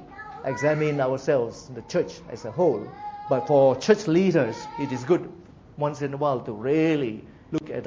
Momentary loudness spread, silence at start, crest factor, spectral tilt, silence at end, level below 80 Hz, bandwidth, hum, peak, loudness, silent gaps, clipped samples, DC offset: 14 LU; 0 s; 18 dB; -6.5 dB/octave; 0 s; -58 dBFS; 7.8 kHz; none; -6 dBFS; -24 LUFS; none; under 0.1%; under 0.1%